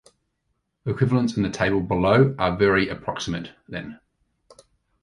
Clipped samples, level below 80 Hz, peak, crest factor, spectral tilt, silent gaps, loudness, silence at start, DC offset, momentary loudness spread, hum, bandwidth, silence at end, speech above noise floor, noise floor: under 0.1%; -46 dBFS; -6 dBFS; 18 dB; -6.5 dB/octave; none; -22 LUFS; 0.85 s; under 0.1%; 16 LU; none; 11 kHz; 1.1 s; 53 dB; -75 dBFS